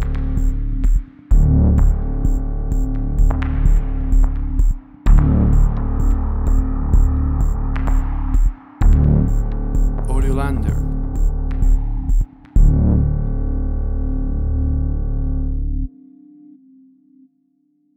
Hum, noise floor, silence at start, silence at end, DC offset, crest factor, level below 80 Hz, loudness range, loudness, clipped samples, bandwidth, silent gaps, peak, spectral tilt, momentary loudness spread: none; -62 dBFS; 0 s; 2.1 s; under 0.1%; 14 dB; -16 dBFS; 5 LU; -20 LUFS; under 0.1%; 8 kHz; none; -2 dBFS; -9 dB/octave; 8 LU